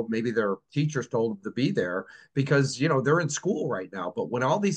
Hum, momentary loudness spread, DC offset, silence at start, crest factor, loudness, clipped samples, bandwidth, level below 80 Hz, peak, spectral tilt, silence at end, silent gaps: none; 8 LU; under 0.1%; 0 s; 18 dB; -27 LUFS; under 0.1%; 9.4 kHz; -70 dBFS; -10 dBFS; -5.5 dB/octave; 0 s; none